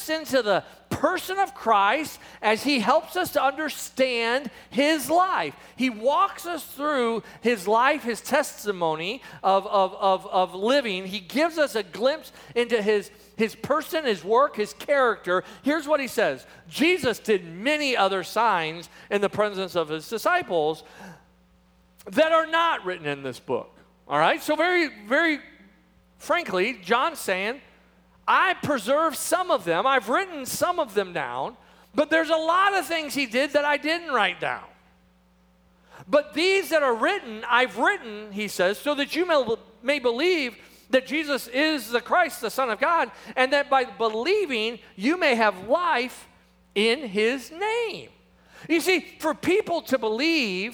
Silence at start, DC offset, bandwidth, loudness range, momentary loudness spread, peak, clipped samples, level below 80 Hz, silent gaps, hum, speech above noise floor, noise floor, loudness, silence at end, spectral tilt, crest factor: 0 s; under 0.1%; over 20 kHz; 2 LU; 9 LU; -4 dBFS; under 0.1%; -64 dBFS; none; none; 36 dB; -60 dBFS; -24 LUFS; 0 s; -3.5 dB/octave; 20 dB